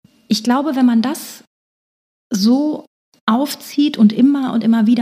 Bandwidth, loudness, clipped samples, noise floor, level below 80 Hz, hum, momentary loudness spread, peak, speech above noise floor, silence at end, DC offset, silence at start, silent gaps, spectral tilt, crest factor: 15.5 kHz; -16 LUFS; under 0.1%; under -90 dBFS; -76 dBFS; none; 11 LU; -2 dBFS; over 75 dB; 0 s; under 0.1%; 0.3 s; 1.47-2.30 s, 2.87-3.12 s, 3.21-3.27 s; -5.5 dB/octave; 14 dB